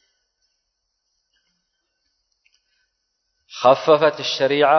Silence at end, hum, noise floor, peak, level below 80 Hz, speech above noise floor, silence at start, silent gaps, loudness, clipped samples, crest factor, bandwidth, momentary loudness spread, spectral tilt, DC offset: 0 s; none; -75 dBFS; -2 dBFS; -70 dBFS; 60 dB; 3.55 s; none; -17 LUFS; under 0.1%; 20 dB; 6.4 kHz; 6 LU; -4 dB/octave; under 0.1%